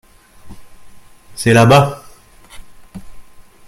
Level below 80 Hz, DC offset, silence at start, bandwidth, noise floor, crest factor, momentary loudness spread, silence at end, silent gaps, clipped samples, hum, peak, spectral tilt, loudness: -44 dBFS; under 0.1%; 0.45 s; 15.5 kHz; -41 dBFS; 18 dB; 26 LU; 0.45 s; none; under 0.1%; none; 0 dBFS; -6 dB/octave; -11 LUFS